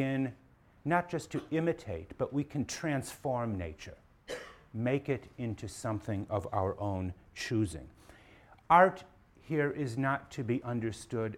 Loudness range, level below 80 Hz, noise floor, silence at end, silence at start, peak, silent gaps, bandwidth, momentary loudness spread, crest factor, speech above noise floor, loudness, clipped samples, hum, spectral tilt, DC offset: 6 LU; -60 dBFS; -59 dBFS; 0 s; 0 s; -10 dBFS; none; 16.5 kHz; 12 LU; 24 dB; 26 dB; -34 LUFS; under 0.1%; none; -6.5 dB/octave; under 0.1%